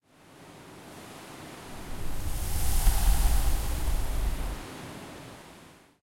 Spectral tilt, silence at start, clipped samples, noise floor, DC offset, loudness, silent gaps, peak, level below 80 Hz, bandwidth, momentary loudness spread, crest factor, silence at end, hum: -4 dB/octave; 0.4 s; under 0.1%; -53 dBFS; under 0.1%; -32 LUFS; none; -10 dBFS; -30 dBFS; 16.5 kHz; 21 LU; 18 dB; 0.45 s; none